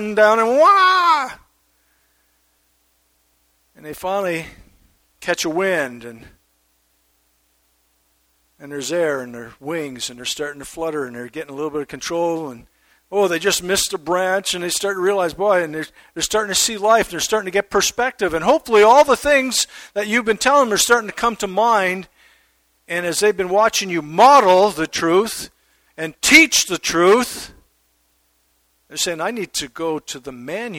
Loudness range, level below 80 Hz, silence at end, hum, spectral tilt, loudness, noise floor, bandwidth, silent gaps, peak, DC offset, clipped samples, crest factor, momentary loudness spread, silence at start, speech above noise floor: 12 LU; -52 dBFS; 0 s; none; -2 dB/octave; -17 LUFS; -63 dBFS; 17.5 kHz; none; 0 dBFS; under 0.1%; under 0.1%; 20 dB; 18 LU; 0 s; 46 dB